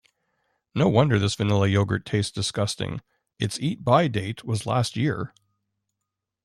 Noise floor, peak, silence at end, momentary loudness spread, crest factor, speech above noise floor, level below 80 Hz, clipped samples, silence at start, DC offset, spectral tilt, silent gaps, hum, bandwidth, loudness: -84 dBFS; -6 dBFS; 1.15 s; 11 LU; 20 dB; 61 dB; -56 dBFS; under 0.1%; 0.75 s; under 0.1%; -6 dB/octave; none; none; 12.5 kHz; -24 LUFS